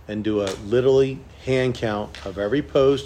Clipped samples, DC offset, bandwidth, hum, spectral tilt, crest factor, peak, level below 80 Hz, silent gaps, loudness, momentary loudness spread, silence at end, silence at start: under 0.1%; under 0.1%; 10 kHz; none; -6.5 dB/octave; 16 dB; -6 dBFS; -46 dBFS; none; -22 LUFS; 10 LU; 0 s; 0.1 s